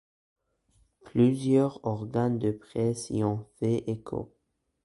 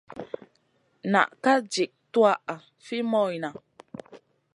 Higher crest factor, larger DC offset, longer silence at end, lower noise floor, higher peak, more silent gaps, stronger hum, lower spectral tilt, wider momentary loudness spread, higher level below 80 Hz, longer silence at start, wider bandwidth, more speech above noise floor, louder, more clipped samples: about the same, 18 dB vs 22 dB; neither; first, 0.6 s vs 0.4 s; about the same, -68 dBFS vs -68 dBFS; second, -12 dBFS vs -4 dBFS; neither; neither; first, -8 dB/octave vs -4.5 dB/octave; second, 10 LU vs 21 LU; first, -60 dBFS vs -76 dBFS; first, 1.05 s vs 0.15 s; about the same, 11.5 kHz vs 11 kHz; second, 40 dB vs 44 dB; second, -28 LUFS vs -25 LUFS; neither